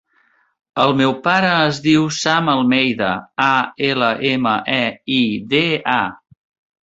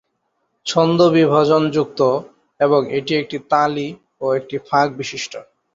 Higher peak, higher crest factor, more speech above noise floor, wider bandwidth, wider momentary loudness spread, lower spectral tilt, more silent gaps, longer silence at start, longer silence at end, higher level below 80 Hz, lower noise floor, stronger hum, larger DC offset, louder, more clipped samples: about the same, 0 dBFS vs -2 dBFS; about the same, 18 dB vs 16 dB; second, 43 dB vs 53 dB; about the same, 8 kHz vs 7.8 kHz; second, 4 LU vs 13 LU; about the same, -4.5 dB/octave vs -5.5 dB/octave; neither; about the same, 0.75 s vs 0.65 s; first, 0.7 s vs 0.3 s; about the same, -56 dBFS vs -60 dBFS; second, -59 dBFS vs -70 dBFS; neither; neither; about the same, -16 LUFS vs -18 LUFS; neither